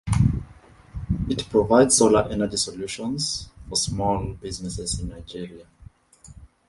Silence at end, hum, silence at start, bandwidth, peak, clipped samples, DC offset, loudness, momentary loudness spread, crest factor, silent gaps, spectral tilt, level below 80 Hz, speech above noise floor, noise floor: 0.25 s; none; 0.05 s; 11.5 kHz; -4 dBFS; under 0.1%; under 0.1%; -23 LUFS; 19 LU; 20 dB; none; -4.5 dB/octave; -38 dBFS; 27 dB; -50 dBFS